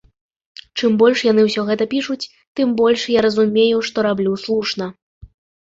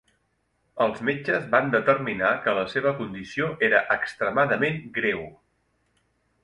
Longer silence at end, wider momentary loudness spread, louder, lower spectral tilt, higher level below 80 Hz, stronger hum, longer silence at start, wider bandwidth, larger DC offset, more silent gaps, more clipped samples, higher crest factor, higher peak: second, 0.4 s vs 1.1 s; first, 12 LU vs 8 LU; first, -17 LUFS vs -24 LUFS; second, -5 dB/octave vs -6.5 dB/octave; first, -56 dBFS vs -62 dBFS; neither; about the same, 0.75 s vs 0.75 s; second, 7.8 kHz vs 11 kHz; neither; first, 2.47-2.55 s, 5.02-5.21 s vs none; neither; second, 16 dB vs 22 dB; about the same, -2 dBFS vs -4 dBFS